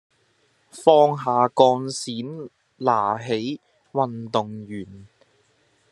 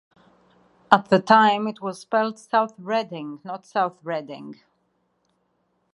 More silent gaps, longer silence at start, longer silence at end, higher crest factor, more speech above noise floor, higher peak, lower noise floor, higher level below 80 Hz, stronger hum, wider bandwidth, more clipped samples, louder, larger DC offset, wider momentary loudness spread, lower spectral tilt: neither; second, 0.75 s vs 0.9 s; second, 0.85 s vs 1.4 s; about the same, 22 dB vs 24 dB; second, 43 dB vs 48 dB; about the same, -2 dBFS vs 0 dBFS; second, -64 dBFS vs -70 dBFS; about the same, -72 dBFS vs -72 dBFS; neither; about the same, 12 kHz vs 11.5 kHz; neither; about the same, -21 LUFS vs -22 LUFS; neither; about the same, 19 LU vs 18 LU; about the same, -5.5 dB/octave vs -5.5 dB/octave